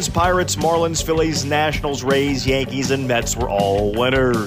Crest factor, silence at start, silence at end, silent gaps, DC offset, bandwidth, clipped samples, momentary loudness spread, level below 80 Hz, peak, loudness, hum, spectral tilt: 14 dB; 0 s; 0 s; none; under 0.1%; 16 kHz; under 0.1%; 3 LU; -34 dBFS; -4 dBFS; -18 LUFS; none; -4.5 dB/octave